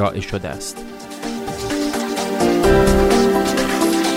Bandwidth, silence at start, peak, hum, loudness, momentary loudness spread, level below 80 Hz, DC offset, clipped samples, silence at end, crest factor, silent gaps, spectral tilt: 16 kHz; 0 s; -2 dBFS; none; -18 LUFS; 15 LU; -30 dBFS; under 0.1%; under 0.1%; 0 s; 16 dB; none; -4.5 dB/octave